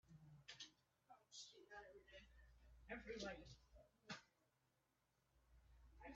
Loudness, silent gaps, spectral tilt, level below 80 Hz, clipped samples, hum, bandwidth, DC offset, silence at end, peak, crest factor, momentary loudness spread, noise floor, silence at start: -59 LUFS; none; -2.5 dB/octave; -74 dBFS; under 0.1%; none; 7.4 kHz; under 0.1%; 0 s; -38 dBFS; 24 dB; 13 LU; -86 dBFS; 0.05 s